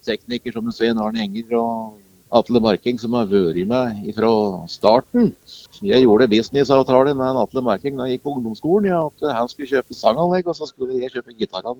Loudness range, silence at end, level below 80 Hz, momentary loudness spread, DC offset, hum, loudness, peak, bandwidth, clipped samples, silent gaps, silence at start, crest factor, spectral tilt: 4 LU; 0.05 s; -52 dBFS; 11 LU; under 0.1%; none; -19 LUFS; 0 dBFS; 20 kHz; under 0.1%; none; 0.05 s; 18 dB; -7 dB/octave